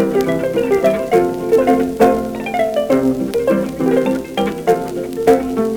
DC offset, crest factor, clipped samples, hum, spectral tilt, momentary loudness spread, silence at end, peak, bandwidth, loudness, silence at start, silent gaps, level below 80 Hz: under 0.1%; 16 dB; under 0.1%; none; -6.5 dB/octave; 5 LU; 0 s; 0 dBFS; over 20 kHz; -16 LUFS; 0 s; none; -42 dBFS